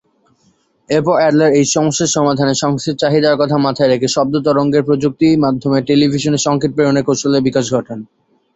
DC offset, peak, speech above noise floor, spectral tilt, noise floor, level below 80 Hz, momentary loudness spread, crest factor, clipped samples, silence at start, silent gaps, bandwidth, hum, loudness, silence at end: under 0.1%; 0 dBFS; 44 dB; -5 dB/octave; -57 dBFS; -50 dBFS; 5 LU; 14 dB; under 0.1%; 0.9 s; none; 8.2 kHz; none; -14 LUFS; 0.5 s